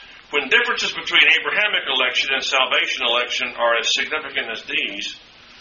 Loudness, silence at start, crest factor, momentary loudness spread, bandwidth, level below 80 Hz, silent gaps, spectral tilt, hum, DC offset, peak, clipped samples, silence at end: -18 LUFS; 0 s; 20 dB; 10 LU; 7.2 kHz; -60 dBFS; none; 3 dB/octave; none; under 0.1%; 0 dBFS; under 0.1%; 0 s